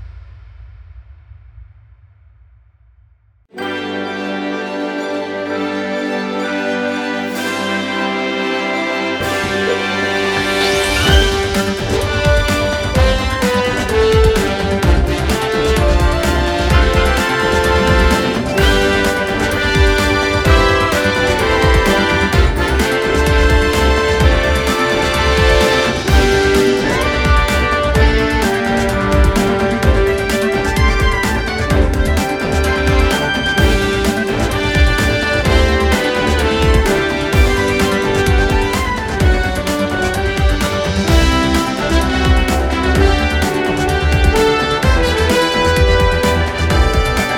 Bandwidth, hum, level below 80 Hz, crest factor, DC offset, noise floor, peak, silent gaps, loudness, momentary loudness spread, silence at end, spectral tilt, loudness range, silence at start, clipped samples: 18.5 kHz; none; -20 dBFS; 14 dB; under 0.1%; -51 dBFS; 0 dBFS; none; -14 LUFS; 6 LU; 0 s; -5 dB/octave; 6 LU; 0 s; under 0.1%